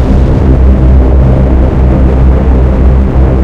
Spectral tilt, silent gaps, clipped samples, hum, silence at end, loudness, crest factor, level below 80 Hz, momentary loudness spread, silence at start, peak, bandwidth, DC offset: -10 dB/octave; none; 6%; none; 0 s; -7 LUFS; 4 dB; -6 dBFS; 2 LU; 0 s; 0 dBFS; 3.9 kHz; under 0.1%